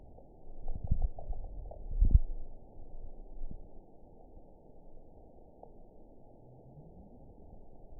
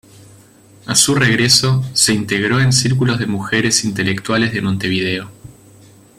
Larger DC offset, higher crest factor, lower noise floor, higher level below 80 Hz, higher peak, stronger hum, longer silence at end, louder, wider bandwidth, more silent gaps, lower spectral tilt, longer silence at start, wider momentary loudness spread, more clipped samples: neither; first, 26 dB vs 16 dB; first, -55 dBFS vs -45 dBFS; first, -38 dBFS vs -48 dBFS; second, -10 dBFS vs 0 dBFS; neither; second, 0 s vs 0.7 s; second, -38 LUFS vs -14 LUFS; second, 1 kHz vs 16 kHz; neither; first, -15.5 dB/octave vs -3.5 dB/octave; second, 0 s vs 0.85 s; first, 25 LU vs 8 LU; neither